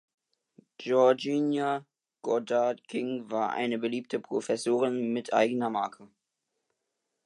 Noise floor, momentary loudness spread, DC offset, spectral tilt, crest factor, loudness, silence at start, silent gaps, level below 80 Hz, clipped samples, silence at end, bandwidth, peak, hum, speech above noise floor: -83 dBFS; 10 LU; under 0.1%; -5 dB/octave; 20 dB; -29 LUFS; 0.8 s; none; -84 dBFS; under 0.1%; 1.2 s; 11.5 kHz; -10 dBFS; none; 55 dB